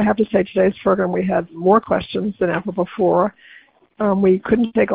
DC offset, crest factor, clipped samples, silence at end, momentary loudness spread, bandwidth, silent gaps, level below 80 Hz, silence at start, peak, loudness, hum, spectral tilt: under 0.1%; 16 dB; under 0.1%; 0 s; 6 LU; 4.9 kHz; none; -50 dBFS; 0 s; -2 dBFS; -18 LUFS; none; -12 dB/octave